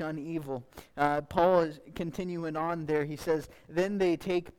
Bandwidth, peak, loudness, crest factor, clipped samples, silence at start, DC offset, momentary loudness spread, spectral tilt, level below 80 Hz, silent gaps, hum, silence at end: 16.5 kHz; -10 dBFS; -31 LUFS; 20 dB; under 0.1%; 0 s; under 0.1%; 12 LU; -6.5 dB/octave; -58 dBFS; none; none; 0.1 s